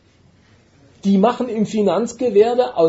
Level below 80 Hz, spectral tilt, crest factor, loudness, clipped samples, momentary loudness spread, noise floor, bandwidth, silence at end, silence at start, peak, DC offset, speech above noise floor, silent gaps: -60 dBFS; -7 dB/octave; 14 dB; -17 LUFS; under 0.1%; 6 LU; -53 dBFS; 8 kHz; 0 s; 1.05 s; -4 dBFS; under 0.1%; 37 dB; none